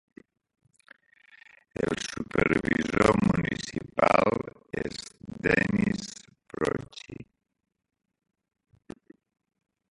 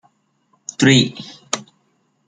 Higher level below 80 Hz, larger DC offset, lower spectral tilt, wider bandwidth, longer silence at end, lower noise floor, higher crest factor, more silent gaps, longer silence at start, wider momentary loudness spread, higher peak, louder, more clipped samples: first, -52 dBFS vs -58 dBFS; neither; first, -5.5 dB/octave vs -4 dB/octave; first, 11.5 kHz vs 9.6 kHz; first, 2.7 s vs 0.65 s; second, -59 dBFS vs -64 dBFS; first, 26 dB vs 20 dB; neither; first, 1.8 s vs 0.8 s; about the same, 21 LU vs 21 LU; second, -4 dBFS vs 0 dBFS; second, -27 LUFS vs -17 LUFS; neither